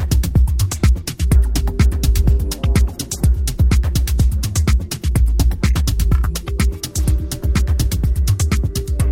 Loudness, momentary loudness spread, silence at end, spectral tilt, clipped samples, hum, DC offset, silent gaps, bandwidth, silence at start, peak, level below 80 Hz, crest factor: -18 LUFS; 4 LU; 0 s; -5.5 dB/octave; under 0.1%; none; under 0.1%; none; 16.5 kHz; 0 s; -2 dBFS; -16 dBFS; 12 dB